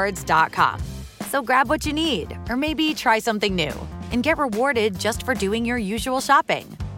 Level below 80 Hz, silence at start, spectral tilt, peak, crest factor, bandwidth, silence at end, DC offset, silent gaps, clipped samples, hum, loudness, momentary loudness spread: -40 dBFS; 0 s; -4 dB/octave; -2 dBFS; 20 dB; 17 kHz; 0 s; under 0.1%; none; under 0.1%; none; -21 LUFS; 8 LU